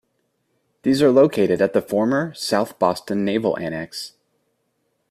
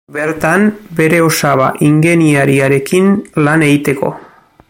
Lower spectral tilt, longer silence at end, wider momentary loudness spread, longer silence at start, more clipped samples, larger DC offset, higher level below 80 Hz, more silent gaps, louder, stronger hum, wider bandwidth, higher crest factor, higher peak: about the same, -5.5 dB/octave vs -6 dB/octave; first, 1 s vs 0.5 s; first, 13 LU vs 6 LU; first, 0.85 s vs 0.1 s; neither; neither; second, -60 dBFS vs -48 dBFS; neither; second, -20 LUFS vs -11 LUFS; neither; second, 15 kHz vs 17 kHz; first, 18 dB vs 12 dB; second, -4 dBFS vs 0 dBFS